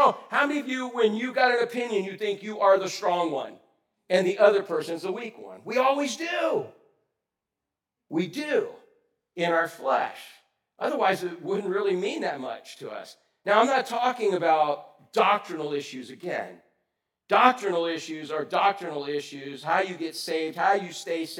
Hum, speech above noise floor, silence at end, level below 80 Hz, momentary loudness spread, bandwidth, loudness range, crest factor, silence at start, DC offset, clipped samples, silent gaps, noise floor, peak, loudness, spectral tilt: none; 61 dB; 0 s; under -90 dBFS; 14 LU; 17 kHz; 4 LU; 26 dB; 0 s; under 0.1%; under 0.1%; none; -87 dBFS; -2 dBFS; -26 LUFS; -4 dB/octave